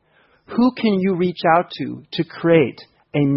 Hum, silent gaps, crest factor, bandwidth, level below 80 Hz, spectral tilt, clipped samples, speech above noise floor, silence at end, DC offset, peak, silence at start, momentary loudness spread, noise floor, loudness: none; none; 18 dB; 5.8 kHz; -58 dBFS; -11.5 dB/octave; under 0.1%; 35 dB; 0 s; under 0.1%; -2 dBFS; 0.5 s; 11 LU; -53 dBFS; -19 LUFS